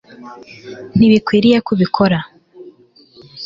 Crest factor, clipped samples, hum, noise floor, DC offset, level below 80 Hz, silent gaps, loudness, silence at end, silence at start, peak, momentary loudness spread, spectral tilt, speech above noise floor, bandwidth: 16 dB; under 0.1%; none; -47 dBFS; under 0.1%; -48 dBFS; none; -14 LUFS; 0 s; 0.2 s; 0 dBFS; 24 LU; -7.5 dB/octave; 33 dB; 7.4 kHz